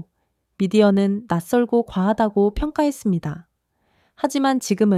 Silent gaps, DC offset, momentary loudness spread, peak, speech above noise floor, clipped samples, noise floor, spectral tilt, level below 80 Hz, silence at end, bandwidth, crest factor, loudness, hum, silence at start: none; under 0.1%; 9 LU; -4 dBFS; 52 dB; under 0.1%; -71 dBFS; -6.5 dB/octave; -42 dBFS; 0 s; 14.5 kHz; 16 dB; -20 LUFS; none; 0.6 s